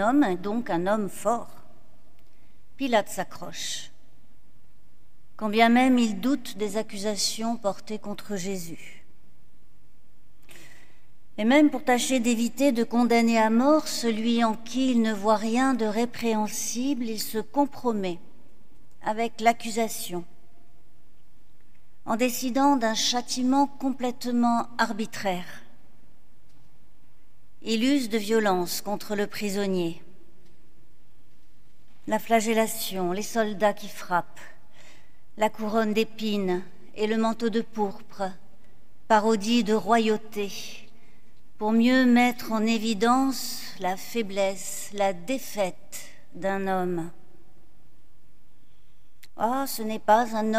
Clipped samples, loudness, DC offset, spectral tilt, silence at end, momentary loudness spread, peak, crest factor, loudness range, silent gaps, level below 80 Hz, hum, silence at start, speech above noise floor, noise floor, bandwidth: under 0.1%; -26 LUFS; 2%; -4 dB/octave; 0 s; 13 LU; -6 dBFS; 22 dB; 10 LU; none; -64 dBFS; none; 0 s; 36 dB; -61 dBFS; 16 kHz